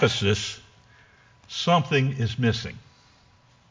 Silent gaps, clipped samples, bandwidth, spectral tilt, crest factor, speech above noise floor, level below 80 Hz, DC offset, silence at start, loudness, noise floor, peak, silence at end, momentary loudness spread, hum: none; under 0.1%; 7.6 kHz; -5 dB/octave; 20 dB; 34 dB; -48 dBFS; under 0.1%; 0 s; -24 LUFS; -58 dBFS; -8 dBFS; 0.9 s; 17 LU; none